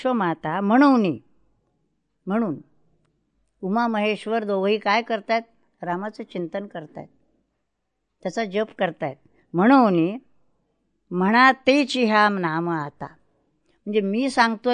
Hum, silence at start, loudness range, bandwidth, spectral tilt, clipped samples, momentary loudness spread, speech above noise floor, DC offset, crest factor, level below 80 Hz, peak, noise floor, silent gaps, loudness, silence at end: none; 0 s; 10 LU; 10 kHz; -6 dB/octave; under 0.1%; 19 LU; 57 dB; under 0.1%; 20 dB; -70 dBFS; -2 dBFS; -78 dBFS; none; -21 LUFS; 0 s